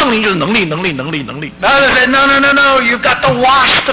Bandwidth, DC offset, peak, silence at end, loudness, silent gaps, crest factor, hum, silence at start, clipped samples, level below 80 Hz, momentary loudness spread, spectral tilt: 4 kHz; under 0.1%; -4 dBFS; 0 s; -10 LUFS; none; 6 dB; none; 0 s; under 0.1%; -38 dBFS; 10 LU; -8 dB/octave